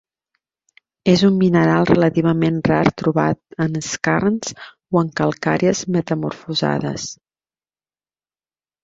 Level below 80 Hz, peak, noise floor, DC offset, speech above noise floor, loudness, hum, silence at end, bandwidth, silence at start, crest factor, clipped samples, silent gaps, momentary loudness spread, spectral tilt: -50 dBFS; 0 dBFS; under -90 dBFS; under 0.1%; over 73 dB; -18 LUFS; none; 1.7 s; 7.8 kHz; 1.05 s; 18 dB; under 0.1%; none; 9 LU; -6 dB/octave